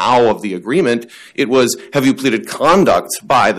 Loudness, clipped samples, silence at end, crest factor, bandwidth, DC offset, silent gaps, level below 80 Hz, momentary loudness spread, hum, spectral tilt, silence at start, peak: -14 LUFS; under 0.1%; 0 s; 10 dB; 15.5 kHz; under 0.1%; none; -48 dBFS; 9 LU; none; -4.5 dB/octave; 0 s; -4 dBFS